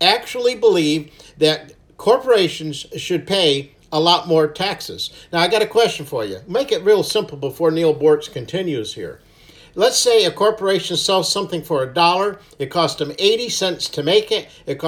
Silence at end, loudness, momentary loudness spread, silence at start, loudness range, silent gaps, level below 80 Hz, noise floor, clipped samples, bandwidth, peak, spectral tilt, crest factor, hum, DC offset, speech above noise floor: 0 s; -18 LUFS; 10 LU; 0 s; 2 LU; none; -56 dBFS; -47 dBFS; under 0.1%; 18 kHz; 0 dBFS; -3.5 dB/octave; 18 dB; none; under 0.1%; 29 dB